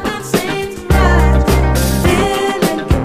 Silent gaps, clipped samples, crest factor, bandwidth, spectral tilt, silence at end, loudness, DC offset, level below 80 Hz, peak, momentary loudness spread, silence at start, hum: none; under 0.1%; 12 dB; 15.5 kHz; -5.5 dB/octave; 0 s; -14 LUFS; under 0.1%; -16 dBFS; 0 dBFS; 6 LU; 0 s; none